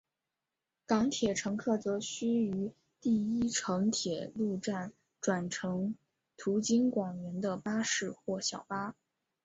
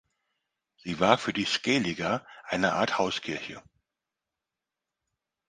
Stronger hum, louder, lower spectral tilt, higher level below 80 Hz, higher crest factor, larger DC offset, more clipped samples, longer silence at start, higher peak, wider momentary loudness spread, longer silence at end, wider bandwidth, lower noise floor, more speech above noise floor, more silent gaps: neither; second, -34 LUFS vs -28 LUFS; about the same, -4.5 dB/octave vs -4 dB/octave; about the same, -68 dBFS vs -64 dBFS; second, 18 dB vs 28 dB; neither; neither; about the same, 0.9 s vs 0.85 s; second, -16 dBFS vs -4 dBFS; second, 9 LU vs 13 LU; second, 0.5 s vs 1.9 s; second, 8.2 kHz vs 10 kHz; about the same, -89 dBFS vs -88 dBFS; second, 56 dB vs 60 dB; neither